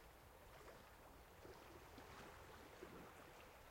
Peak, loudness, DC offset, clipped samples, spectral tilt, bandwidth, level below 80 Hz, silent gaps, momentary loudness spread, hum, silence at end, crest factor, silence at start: -44 dBFS; -61 LUFS; under 0.1%; under 0.1%; -4 dB/octave; 16.5 kHz; -72 dBFS; none; 5 LU; none; 0 s; 18 dB; 0 s